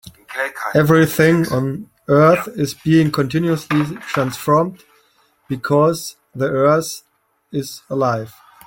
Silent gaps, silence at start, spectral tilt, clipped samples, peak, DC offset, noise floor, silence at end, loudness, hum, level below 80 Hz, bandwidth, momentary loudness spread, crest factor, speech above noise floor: none; 0.05 s; -6.5 dB/octave; under 0.1%; 0 dBFS; under 0.1%; -58 dBFS; 0.35 s; -17 LUFS; none; -54 dBFS; 17 kHz; 14 LU; 18 dB; 42 dB